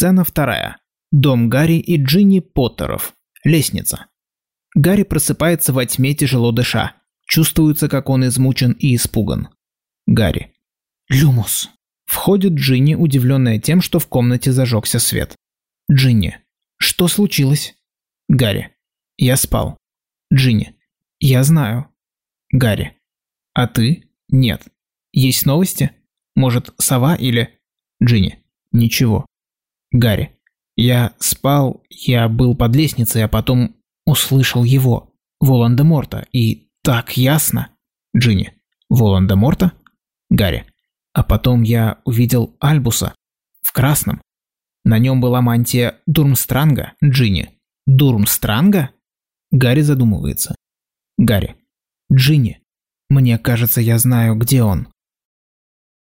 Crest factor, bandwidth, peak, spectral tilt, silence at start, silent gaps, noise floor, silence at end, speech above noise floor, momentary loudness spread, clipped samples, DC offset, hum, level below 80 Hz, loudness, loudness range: 12 dB; 16.5 kHz; -4 dBFS; -5.5 dB/octave; 0 s; none; under -90 dBFS; 1.35 s; over 76 dB; 9 LU; under 0.1%; under 0.1%; none; -36 dBFS; -15 LUFS; 3 LU